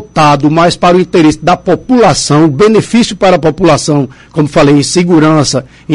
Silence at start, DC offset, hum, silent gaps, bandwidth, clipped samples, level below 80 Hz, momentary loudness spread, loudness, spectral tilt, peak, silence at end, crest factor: 0 s; 0.7%; none; none; 11.5 kHz; 0.1%; -36 dBFS; 5 LU; -8 LUFS; -5.5 dB/octave; 0 dBFS; 0 s; 8 dB